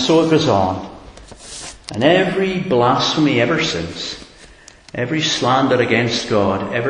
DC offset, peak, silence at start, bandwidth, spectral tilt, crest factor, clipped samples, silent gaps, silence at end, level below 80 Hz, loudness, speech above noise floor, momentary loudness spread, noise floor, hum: under 0.1%; 0 dBFS; 0 s; 10.5 kHz; -5 dB/octave; 18 dB; under 0.1%; none; 0 s; -44 dBFS; -16 LUFS; 27 dB; 17 LU; -43 dBFS; none